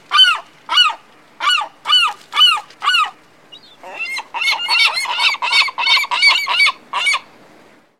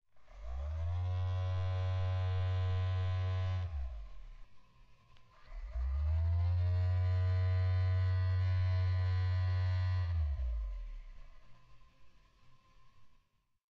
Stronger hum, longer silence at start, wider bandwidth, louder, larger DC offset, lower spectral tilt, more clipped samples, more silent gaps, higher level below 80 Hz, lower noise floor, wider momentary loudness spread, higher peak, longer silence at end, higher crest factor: neither; about the same, 0.1 s vs 0.15 s; first, 16.5 kHz vs 5.2 kHz; first, -13 LUFS vs -35 LUFS; first, 0.2% vs under 0.1%; second, 3 dB/octave vs -6 dB/octave; neither; neither; second, -74 dBFS vs -44 dBFS; second, -47 dBFS vs -71 dBFS; second, 11 LU vs 14 LU; first, 0 dBFS vs -26 dBFS; about the same, 0.8 s vs 0.7 s; first, 16 dB vs 8 dB